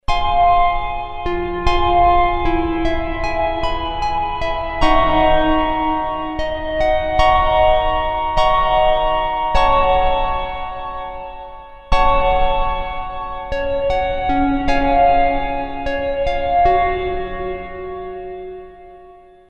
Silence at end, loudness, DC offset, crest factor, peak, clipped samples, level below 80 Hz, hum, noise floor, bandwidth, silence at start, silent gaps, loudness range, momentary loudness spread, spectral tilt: 0.35 s; -18 LUFS; under 0.1%; 16 dB; 0 dBFS; under 0.1%; -26 dBFS; none; -43 dBFS; 8 kHz; 0.1 s; none; 4 LU; 13 LU; -6 dB/octave